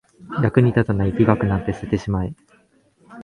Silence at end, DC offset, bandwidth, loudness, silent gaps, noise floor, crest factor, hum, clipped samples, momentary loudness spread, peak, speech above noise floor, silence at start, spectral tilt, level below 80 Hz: 0 s; under 0.1%; 9.6 kHz; -20 LUFS; none; -58 dBFS; 20 dB; none; under 0.1%; 9 LU; 0 dBFS; 39 dB; 0.2 s; -9 dB/octave; -38 dBFS